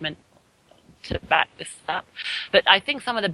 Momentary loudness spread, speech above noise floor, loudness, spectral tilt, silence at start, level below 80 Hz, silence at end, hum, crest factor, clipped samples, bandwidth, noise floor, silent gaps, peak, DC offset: 16 LU; 36 dB; -22 LUFS; -3 dB/octave; 0 s; -50 dBFS; 0 s; none; 24 dB; under 0.1%; 12 kHz; -59 dBFS; none; 0 dBFS; under 0.1%